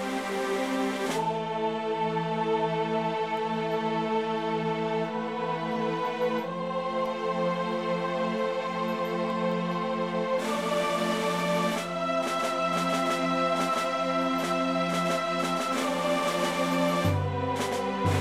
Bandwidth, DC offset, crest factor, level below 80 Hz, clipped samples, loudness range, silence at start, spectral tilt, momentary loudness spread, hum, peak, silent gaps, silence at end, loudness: 16 kHz; under 0.1%; 14 dB; -66 dBFS; under 0.1%; 3 LU; 0 s; -5 dB/octave; 3 LU; none; -14 dBFS; none; 0 s; -28 LUFS